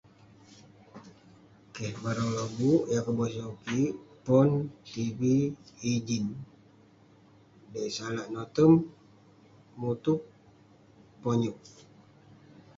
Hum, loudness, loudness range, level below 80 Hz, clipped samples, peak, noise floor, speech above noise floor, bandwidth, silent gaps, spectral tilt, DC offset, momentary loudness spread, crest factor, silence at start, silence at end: none; -29 LUFS; 6 LU; -64 dBFS; under 0.1%; -10 dBFS; -59 dBFS; 30 dB; 7.8 kHz; none; -7 dB/octave; under 0.1%; 15 LU; 20 dB; 0.95 s; 1.1 s